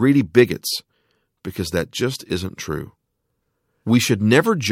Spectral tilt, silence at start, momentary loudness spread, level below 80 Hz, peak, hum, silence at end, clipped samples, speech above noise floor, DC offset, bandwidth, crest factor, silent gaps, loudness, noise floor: -5 dB/octave; 0 s; 16 LU; -50 dBFS; 0 dBFS; none; 0 s; under 0.1%; 55 dB; under 0.1%; 16.5 kHz; 20 dB; none; -20 LUFS; -74 dBFS